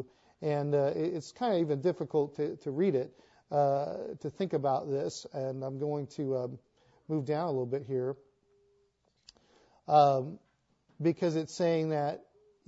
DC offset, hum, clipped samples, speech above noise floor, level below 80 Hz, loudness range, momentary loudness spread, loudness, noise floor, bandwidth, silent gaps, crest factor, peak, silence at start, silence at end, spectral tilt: under 0.1%; none; under 0.1%; 42 dB; -76 dBFS; 5 LU; 10 LU; -32 LUFS; -73 dBFS; 8 kHz; none; 20 dB; -12 dBFS; 0 s; 0.45 s; -7 dB/octave